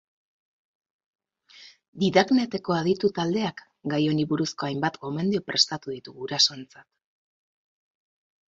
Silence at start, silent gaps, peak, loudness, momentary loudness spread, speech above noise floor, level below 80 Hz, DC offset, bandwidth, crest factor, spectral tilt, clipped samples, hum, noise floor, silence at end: 1.6 s; 1.88-1.93 s; -4 dBFS; -25 LUFS; 11 LU; 27 dB; -66 dBFS; under 0.1%; 8 kHz; 24 dB; -4.5 dB/octave; under 0.1%; none; -53 dBFS; 1.65 s